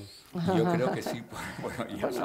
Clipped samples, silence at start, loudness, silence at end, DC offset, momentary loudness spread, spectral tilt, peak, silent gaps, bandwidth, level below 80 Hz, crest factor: under 0.1%; 0 s; -31 LUFS; 0 s; under 0.1%; 11 LU; -6.5 dB/octave; -14 dBFS; none; 16 kHz; -60 dBFS; 18 dB